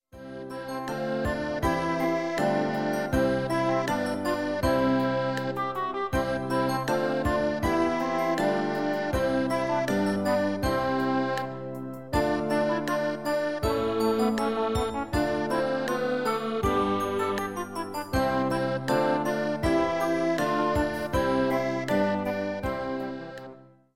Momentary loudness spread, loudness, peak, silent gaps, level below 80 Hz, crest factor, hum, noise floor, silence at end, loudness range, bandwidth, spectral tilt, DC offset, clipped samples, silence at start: 6 LU; -27 LUFS; -12 dBFS; none; -44 dBFS; 14 dB; none; -48 dBFS; 0.2 s; 2 LU; 16.5 kHz; -6 dB/octave; 0.3%; under 0.1%; 0.1 s